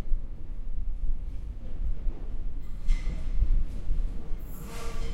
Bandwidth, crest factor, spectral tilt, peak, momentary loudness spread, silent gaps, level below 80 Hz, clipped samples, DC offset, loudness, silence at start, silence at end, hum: 8 kHz; 14 dB; -6.5 dB/octave; -12 dBFS; 9 LU; none; -28 dBFS; under 0.1%; under 0.1%; -37 LUFS; 0 s; 0 s; none